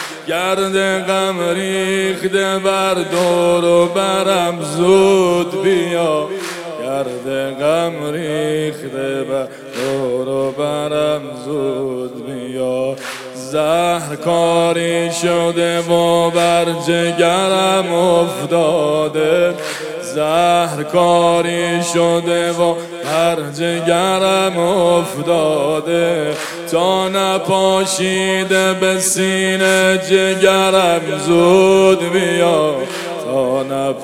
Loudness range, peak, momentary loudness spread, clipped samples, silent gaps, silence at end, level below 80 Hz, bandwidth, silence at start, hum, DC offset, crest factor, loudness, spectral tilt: 7 LU; 0 dBFS; 9 LU; under 0.1%; none; 0 s; -52 dBFS; 16.5 kHz; 0 s; none; under 0.1%; 16 dB; -15 LUFS; -4 dB/octave